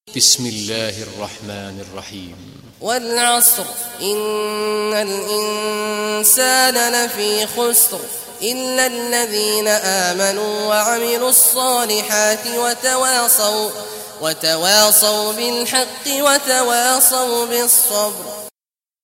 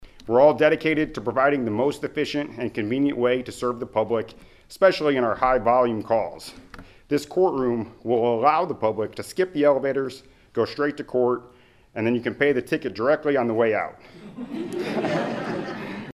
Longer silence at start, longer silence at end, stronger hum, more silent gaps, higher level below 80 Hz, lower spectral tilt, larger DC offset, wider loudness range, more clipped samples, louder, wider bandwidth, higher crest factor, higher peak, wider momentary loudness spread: about the same, 0.05 s vs 0 s; first, 0.55 s vs 0 s; neither; neither; second, -62 dBFS vs -54 dBFS; second, -0.5 dB/octave vs -6 dB/octave; neither; about the same, 4 LU vs 3 LU; neither; first, -15 LUFS vs -23 LUFS; first, 16.5 kHz vs 14 kHz; about the same, 18 dB vs 20 dB; first, 0 dBFS vs -4 dBFS; first, 17 LU vs 11 LU